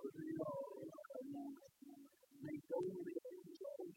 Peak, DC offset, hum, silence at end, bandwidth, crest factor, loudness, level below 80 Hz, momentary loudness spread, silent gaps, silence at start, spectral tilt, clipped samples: -32 dBFS; under 0.1%; none; 0 s; 16.5 kHz; 18 dB; -49 LUFS; -90 dBFS; 17 LU; none; 0 s; -7.5 dB/octave; under 0.1%